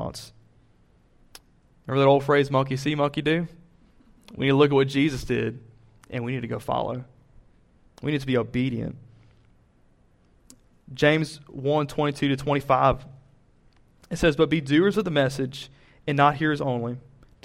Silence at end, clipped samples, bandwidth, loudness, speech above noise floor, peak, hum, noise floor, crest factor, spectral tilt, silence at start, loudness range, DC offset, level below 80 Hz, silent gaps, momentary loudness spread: 0.45 s; under 0.1%; 14 kHz; -24 LUFS; 36 dB; -6 dBFS; none; -60 dBFS; 20 dB; -6.5 dB/octave; 0 s; 7 LU; under 0.1%; -50 dBFS; none; 16 LU